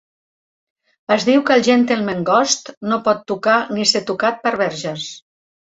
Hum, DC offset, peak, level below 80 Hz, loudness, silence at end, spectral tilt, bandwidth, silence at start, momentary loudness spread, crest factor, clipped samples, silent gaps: none; under 0.1%; -2 dBFS; -62 dBFS; -17 LUFS; 0.5 s; -3.5 dB/octave; 8 kHz; 1.1 s; 11 LU; 16 dB; under 0.1%; 2.77-2.81 s